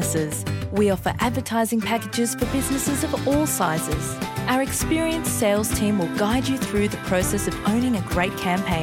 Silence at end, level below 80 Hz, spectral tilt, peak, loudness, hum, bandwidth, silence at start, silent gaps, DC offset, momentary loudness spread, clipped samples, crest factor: 0 s; -38 dBFS; -4.5 dB/octave; -8 dBFS; -23 LUFS; none; 17 kHz; 0 s; none; under 0.1%; 3 LU; under 0.1%; 14 dB